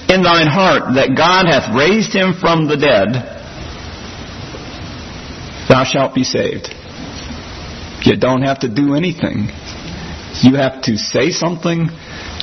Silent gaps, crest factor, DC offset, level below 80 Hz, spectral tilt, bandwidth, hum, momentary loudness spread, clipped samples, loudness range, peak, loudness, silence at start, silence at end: none; 14 dB; under 0.1%; -38 dBFS; -5 dB/octave; 6.4 kHz; none; 18 LU; under 0.1%; 6 LU; 0 dBFS; -13 LUFS; 0 s; 0 s